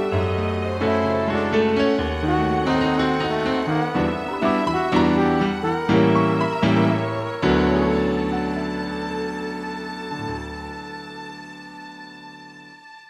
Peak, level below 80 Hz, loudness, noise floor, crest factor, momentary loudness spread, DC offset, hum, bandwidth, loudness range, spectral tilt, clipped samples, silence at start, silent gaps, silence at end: -4 dBFS; -40 dBFS; -21 LUFS; -44 dBFS; 18 dB; 17 LU; under 0.1%; none; 12 kHz; 11 LU; -7 dB/octave; under 0.1%; 0 s; none; 0.1 s